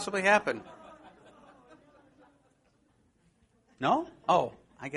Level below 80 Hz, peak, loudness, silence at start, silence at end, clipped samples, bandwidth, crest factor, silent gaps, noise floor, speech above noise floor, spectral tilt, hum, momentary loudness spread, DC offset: -70 dBFS; -8 dBFS; -28 LUFS; 0 s; 0 s; under 0.1%; 11 kHz; 24 dB; none; -69 dBFS; 41 dB; -4.5 dB/octave; none; 26 LU; under 0.1%